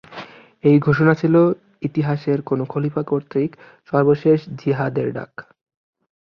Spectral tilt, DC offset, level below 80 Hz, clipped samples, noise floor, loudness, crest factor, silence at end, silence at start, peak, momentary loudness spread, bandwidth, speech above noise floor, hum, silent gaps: -10 dB/octave; under 0.1%; -58 dBFS; under 0.1%; -39 dBFS; -19 LUFS; 18 dB; 0.8 s; 0.1 s; -2 dBFS; 12 LU; 6.2 kHz; 20 dB; none; none